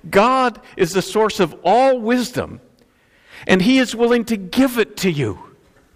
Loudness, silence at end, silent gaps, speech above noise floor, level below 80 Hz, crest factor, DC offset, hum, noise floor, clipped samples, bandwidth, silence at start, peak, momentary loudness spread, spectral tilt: -17 LUFS; 0.5 s; none; 38 dB; -50 dBFS; 18 dB; under 0.1%; none; -55 dBFS; under 0.1%; 15.5 kHz; 0.05 s; 0 dBFS; 10 LU; -5 dB/octave